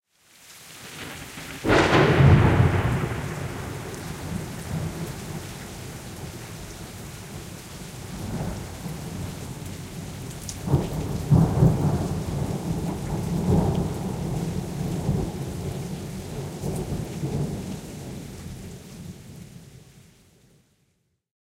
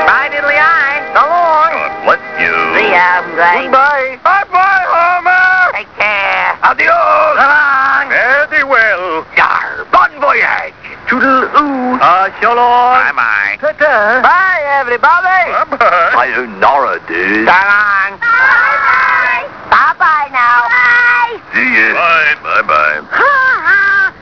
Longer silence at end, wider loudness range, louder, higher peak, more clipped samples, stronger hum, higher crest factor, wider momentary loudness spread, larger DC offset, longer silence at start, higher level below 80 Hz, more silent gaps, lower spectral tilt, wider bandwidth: first, 1.4 s vs 0.1 s; first, 15 LU vs 1 LU; second, -26 LUFS vs -9 LUFS; second, -4 dBFS vs 0 dBFS; second, under 0.1% vs 0.4%; neither; first, 22 dB vs 10 dB; first, 19 LU vs 5 LU; second, under 0.1% vs 0.3%; first, 0.4 s vs 0 s; first, -40 dBFS vs -48 dBFS; neither; first, -6.5 dB/octave vs -4 dB/octave; first, 16 kHz vs 5.4 kHz